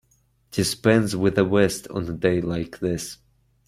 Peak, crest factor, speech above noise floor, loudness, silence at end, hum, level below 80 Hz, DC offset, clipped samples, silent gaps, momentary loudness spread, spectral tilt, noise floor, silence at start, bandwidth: -4 dBFS; 20 dB; 42 dB; -23 LUFS; 0.55 s; none; -50 dBFS; under 0.1%; under 0.1%; none; 11 LU; -5.5 dB/octave; -64 dBFS; 0.55 s; 16 kHz